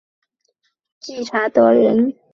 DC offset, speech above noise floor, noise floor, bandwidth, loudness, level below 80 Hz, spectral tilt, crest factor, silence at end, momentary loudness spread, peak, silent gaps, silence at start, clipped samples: under 0.1%; 54 dB; -69 dBFS; 7.2 kHz; -15 LUFS; -64 dBFS; -6 dB/octave; 16 dB; 0.25 s; 19 LU; -2 dBFS; none; 1.05 s; under 0.1%